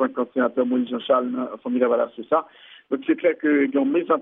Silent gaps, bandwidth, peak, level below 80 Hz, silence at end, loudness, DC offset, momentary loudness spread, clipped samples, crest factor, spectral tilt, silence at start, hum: none; 3.9 kHz; -6 dBFS; -76 dBFS; 0 s; -22 LUFS; under 0.1%; 8 LU; under 0.1%; 16 dB; -3.5 dB/octave; 0 s; none